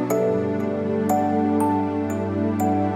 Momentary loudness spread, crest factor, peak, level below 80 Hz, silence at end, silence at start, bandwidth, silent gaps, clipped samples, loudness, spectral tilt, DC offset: 4 LU; 14 dB; -8 dBFS; -64 dBFS; 0 s; 0 s; 16 kHz; none; under 0.1%; -22 LUFS; -7.5 dB/octave; under 0.1%